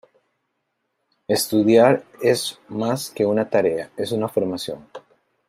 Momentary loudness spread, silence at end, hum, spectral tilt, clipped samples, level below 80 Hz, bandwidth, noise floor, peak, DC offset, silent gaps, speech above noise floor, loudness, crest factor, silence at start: 12 LU; 0.5 s; none; -5 dB/octave; under 0.1%; -66 dBFS; 16 kHz; -75 dBFS; -2 dBFS; under 0.1%; none; 55 dB; -20 LUFS; 20 dB; 1.3 s